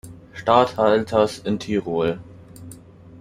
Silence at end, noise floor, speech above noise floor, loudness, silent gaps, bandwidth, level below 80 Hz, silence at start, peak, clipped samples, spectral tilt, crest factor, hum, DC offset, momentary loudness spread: 0.05 s; -43 dBFS; 24 dB; -20 LUFS; none; 15 kHz; -54 dBFS; 0.05 s; -2 dBFS; under 0.1%; -6 dB/octave; 20 dB; none; under 0.1%; 23 LU